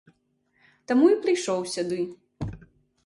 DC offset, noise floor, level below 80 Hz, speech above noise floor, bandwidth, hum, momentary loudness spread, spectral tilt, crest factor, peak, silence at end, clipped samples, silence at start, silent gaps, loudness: under 0.1%; -70 dBFS; -54 dBFS; 47 dB; 11.5 kHz; none; 17 LU; -5 dB/octave; 18 dB; -8 dBFS; 0.5 s; under 0.1%; 0.9 s; none; -24 LUFS